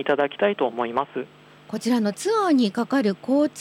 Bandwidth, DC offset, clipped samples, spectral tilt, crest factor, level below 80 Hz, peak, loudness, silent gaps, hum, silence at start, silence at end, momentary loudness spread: 15 kHz; under 0.1%; under 0.1%; -5 dB/octave; 14 dB; -72 dBFS; -8 dBFS; -23 LUFS; none; none; 0 s; 0 s; 11 LU